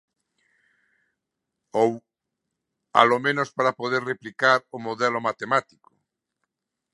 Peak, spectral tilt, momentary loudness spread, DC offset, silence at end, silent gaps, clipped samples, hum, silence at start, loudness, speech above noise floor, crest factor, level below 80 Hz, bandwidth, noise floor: 0 dBFS; -4.5 dB/octave; 10 LU; under 0.1%; 1.3 s; none; under 0.1%; none; 1.75 s; -23 LUFS; 60 dB; 26 dB; -76 dBFS; 11.5 kHz; -83 dBFS